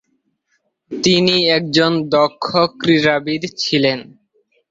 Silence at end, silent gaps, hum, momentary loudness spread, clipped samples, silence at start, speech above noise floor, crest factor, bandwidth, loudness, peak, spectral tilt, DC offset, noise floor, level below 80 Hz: 0.65 s; none; none; 7 LU; under 0.1%; 0.9 s; 51 dB; 16 dB; 7.8 kHz; -15 LUFS; 0 dBFS; -4.5 dB/octave; under 0.1%; -67 dBFS; -56 dBFS